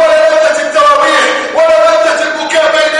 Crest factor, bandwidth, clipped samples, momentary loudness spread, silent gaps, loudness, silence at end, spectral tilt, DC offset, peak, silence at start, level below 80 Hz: 8 dB; 11.5 kHz; 0.5%; 4 LU; none; -8 LUFS; 0 s; -1 dB/octave; under 0.1%; 0 dBFS; 0 s; -50 dBFS